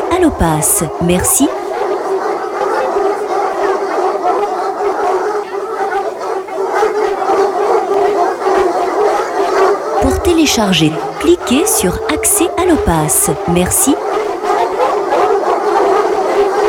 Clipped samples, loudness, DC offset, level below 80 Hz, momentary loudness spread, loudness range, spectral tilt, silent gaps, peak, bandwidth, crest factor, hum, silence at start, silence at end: under 0.1%; -13 LUFS; under 0.1%; -34 dBFS; 6 LU; 4 LU; -4 dB/octave; none; 0 dBFS; 19 kHz; 12 dB; none; 0 s; 0 s